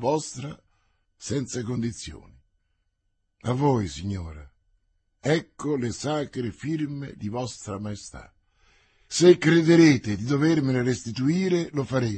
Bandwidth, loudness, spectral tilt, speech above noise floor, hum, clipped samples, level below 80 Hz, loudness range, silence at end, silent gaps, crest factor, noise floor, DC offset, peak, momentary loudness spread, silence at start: 8.8 kHz; -24 LUFS; -6 dB/octave; 50 dB; none; under 0.1%; -54 dBFS; 11 LU; 0 s; none; 22 dB; -74 dBFS; under 0.1%; -4 dBFS; 18 LU; 0 s